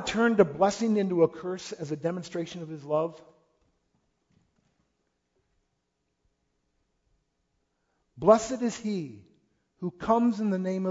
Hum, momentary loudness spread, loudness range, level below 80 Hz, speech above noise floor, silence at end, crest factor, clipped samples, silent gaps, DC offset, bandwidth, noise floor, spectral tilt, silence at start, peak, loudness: none; 14 LU; 10 LU; -64 dBFS; 52 dB; 0 s; 24 dB; under 0.1%; none; under 0.1%; 8 kHz; -79 dBFS; -6 dB/octave; 0 s; -6 dBFS; -27 LUFS